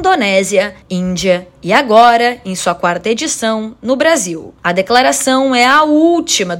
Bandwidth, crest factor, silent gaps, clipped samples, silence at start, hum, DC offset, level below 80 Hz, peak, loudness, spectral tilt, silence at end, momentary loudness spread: 17 kHz; 12 dB; none; 0.5%; 0 s; none; under 0.1%; -48 dBFS; 0 dBFS; -12 LUFS; -3.5 dB/octave; 0 s; 10 LU